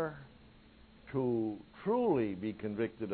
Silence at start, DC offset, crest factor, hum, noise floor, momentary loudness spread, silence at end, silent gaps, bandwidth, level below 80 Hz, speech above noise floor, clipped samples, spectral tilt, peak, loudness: 0 s; under 0.1%; 16 dB; none; -59 dBFS; 10 LU; 0 s; none; 4.5 kHz; -64 dBFS; 26 dB; under 0.1%; -7 dB/octave; -20 dBFS; -35 LUFS